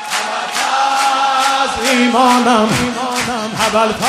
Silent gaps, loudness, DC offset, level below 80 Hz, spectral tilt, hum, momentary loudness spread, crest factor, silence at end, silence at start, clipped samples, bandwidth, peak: none; -14 LUFS; under 0.1%; -46 dBFS; -3 dB/octave; none; 7 LU; 14 dB; 0 s; 0 s; under 0.1%; 15.5 kHz; 0 dBFS